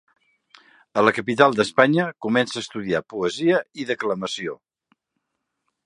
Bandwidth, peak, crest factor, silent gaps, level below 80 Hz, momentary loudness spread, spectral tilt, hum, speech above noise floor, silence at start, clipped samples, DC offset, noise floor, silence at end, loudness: 11.5 kHz; 0 dBFS; 24 dB; none; -64 dBFS; 11 LU; -5 dB/octave; none; 57 dB; 0.95 s; under 0.1%; under 0.1%; -78 dBFS; 1.3 s; -21 LUFS